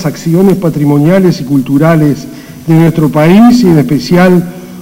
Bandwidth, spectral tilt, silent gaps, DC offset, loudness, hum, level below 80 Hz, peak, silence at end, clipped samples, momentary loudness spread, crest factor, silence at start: 16.5 kHz; -7.5 dB/octave; none; under 0.1%; -7 LUFS; none; -40 dBFS; 0 dBFS; 0 s; 4%; 8 LU; 8 dB; 0 s